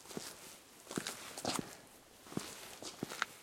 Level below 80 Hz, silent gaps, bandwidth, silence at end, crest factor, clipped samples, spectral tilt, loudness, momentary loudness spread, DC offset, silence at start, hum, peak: -76 dBFS; none; 16.5 kHz; 0 s; 34 dB; under 0.1%; -2.5 dB/octave; -44 LUFS; 15 LU; under 0.1%; 0 s; none; -12 dBFS